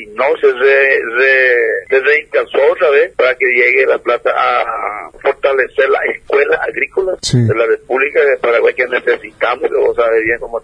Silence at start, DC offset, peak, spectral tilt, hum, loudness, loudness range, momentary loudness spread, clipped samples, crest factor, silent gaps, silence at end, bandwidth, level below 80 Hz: 0 s; under 0.1%; 0 dBFS; -5 dB/octave; none; -12 LUFS; 3 LU; 7 LU; under 0.1%; 12 dB; none; 0.05 s; 10.5 kHz; -48 dBFS